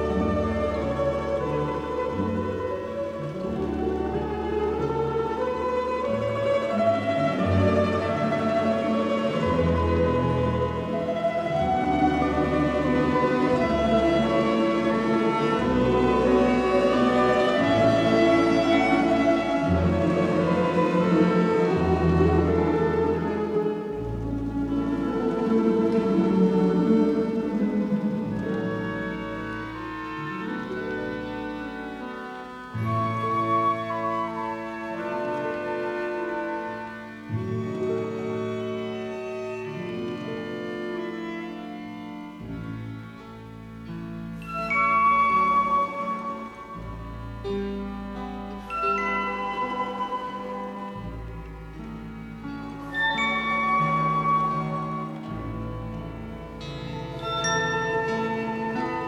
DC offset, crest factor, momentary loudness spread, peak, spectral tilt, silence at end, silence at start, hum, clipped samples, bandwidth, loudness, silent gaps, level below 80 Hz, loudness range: under 0.1%; 18 dB; 15 LU; -8 dBFS; -7 dB/octave; 0 s; 0 s; none; under 0.1%; 11.5 kHz; -25 LUFS; none; -44 dBFS; 10 LU